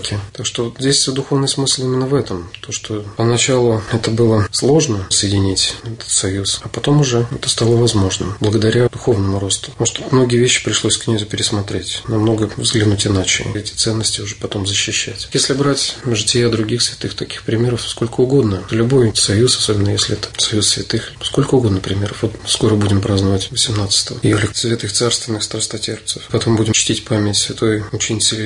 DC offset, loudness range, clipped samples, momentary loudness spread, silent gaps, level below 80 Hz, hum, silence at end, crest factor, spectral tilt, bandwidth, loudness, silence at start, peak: under 0.1%; 2 LU; under 0.1%; 7 LU; none; -42 dBFS; none; 0 s; 14 dB; -4 dB/octave; 11 kHz; -16 LUFS; 0 s; -2 dBFS